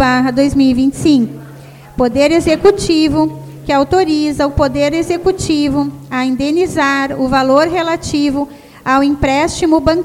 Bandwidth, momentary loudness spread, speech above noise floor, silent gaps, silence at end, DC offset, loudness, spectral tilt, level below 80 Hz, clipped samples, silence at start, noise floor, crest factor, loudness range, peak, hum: 14.5 kHz; 7 LU; 22 dB; none; 0 s; under 0.1%; -13 LUFS; -5 dB/octave; -34 dBFS; under 0.1%; 0 s; -35 dBFS; 12 dB; 2 LU; 0 dBFS; none